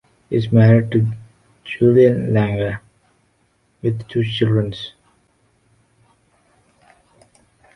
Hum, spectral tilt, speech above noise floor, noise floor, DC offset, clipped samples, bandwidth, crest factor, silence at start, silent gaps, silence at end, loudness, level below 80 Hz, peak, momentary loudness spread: none; -9 dB/octave; 47 dB; -62 dBFS; under 0.1%; under 0.1%; 6 kHz; 18 dB; 0.3 s; none; 2.85 s; -17 LUFS; -50 dBFS; -2 dBFS; 19 LU